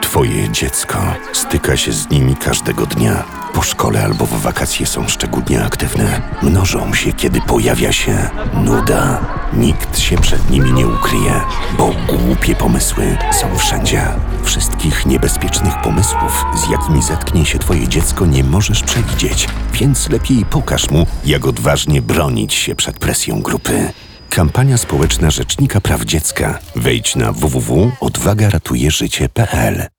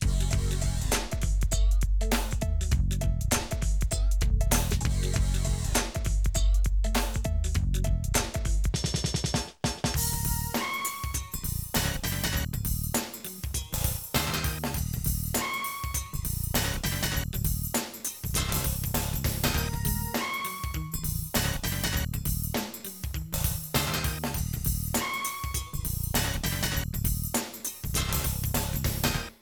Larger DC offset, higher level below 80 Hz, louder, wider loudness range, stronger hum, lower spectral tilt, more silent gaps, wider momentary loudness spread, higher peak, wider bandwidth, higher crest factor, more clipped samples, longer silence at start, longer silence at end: neither; first, -22 dBFS vs -32 dBFS; first, -14 LUFS vs -29 LUFS; about the same, 1 LU vs 2 LU; neither; about the same, -4.5 dB/octave vs -3.5 dB/octave; neither; about the same, 4 LU vs 5 LU; first, -2 dBFS vs -12 dBFS; about the same, over 20 kHz vs over 20 kHz; about the same, 12 dB vs 16 dB; neither; about the same, 0 s vs 0 s; about the same, 0.1 s vs 0.1 s